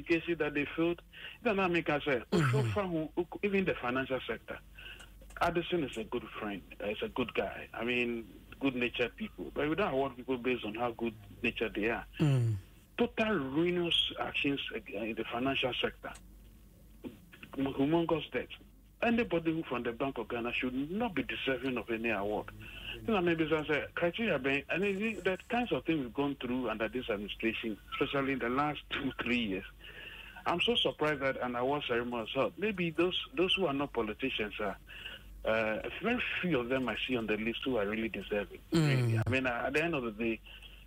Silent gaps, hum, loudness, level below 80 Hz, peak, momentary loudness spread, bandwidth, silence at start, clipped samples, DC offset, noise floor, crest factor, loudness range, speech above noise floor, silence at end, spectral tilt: none; none; -33 LUFS; -56 dBFS; -18 dBFS; 11 LU; 16 kHz; 0 s; under 0.1%; under 0.1%; -57 dBFS; 16 dB; 3 LU; 23 dB; 0 s; -6 dB/octave